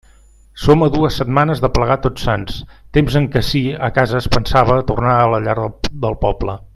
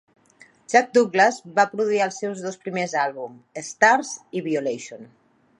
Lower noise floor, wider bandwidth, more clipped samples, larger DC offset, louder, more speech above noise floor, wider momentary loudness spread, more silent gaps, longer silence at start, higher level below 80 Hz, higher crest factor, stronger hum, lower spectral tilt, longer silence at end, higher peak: second, -46 dBFS vs -54 dBFS; first, 13.5 kHz vs 11.5 kHz; neither; neither; first, -16 LUFS vs -21 LUFS; about the same, 31 dB vs 32 dB; second, 8 LU vs 17 LU; neither; second, 0.55 s vs 0.7 s; first, -28 dBFS vs -76 dBFS; second, 16 dB vs 22 dB; neither; first, -7 dB/octave vs -3.5 dB/octave; second, 0.1 s vs 0.55 s; about the same, 0 dBFS vs -2 dBFS